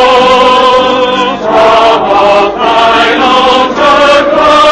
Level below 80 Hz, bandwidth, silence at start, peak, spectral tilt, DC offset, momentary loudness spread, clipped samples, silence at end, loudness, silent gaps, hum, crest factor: -34 dBFS; 11 kHz; 0 s; 0 dBFS; -3.5 dB/octave; under 0.1%; 4 LU; 5%; 0 s; -5 LUFS; none; none; 6 dB